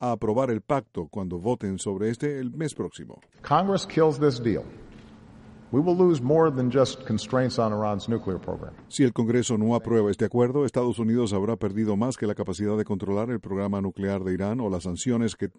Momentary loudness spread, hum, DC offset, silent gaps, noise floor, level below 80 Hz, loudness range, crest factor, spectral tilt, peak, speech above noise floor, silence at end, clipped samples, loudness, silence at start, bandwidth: 10 LU; none; under 0.1%; none; -48 dBFS; -56 dBFS; 4 LU; 18 dB; -6.5 dB/octave; -8 dBFS; 23 dB; 0.1 s; under 0.1%; -26 LUFS; 0 s; 11 kHz